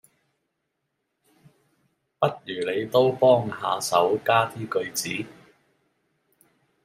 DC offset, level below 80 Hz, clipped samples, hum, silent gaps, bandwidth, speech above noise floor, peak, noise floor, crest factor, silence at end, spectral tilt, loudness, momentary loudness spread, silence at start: under 0.1%; -68 dBFS; under 0.1%; none; none; 16 kHz; 55 dB; -4 dBFS; -78 dBFS; 22 dB; 1.55 s; -4 dB/octave; -23 LUFS; 11 LU; 2.2 s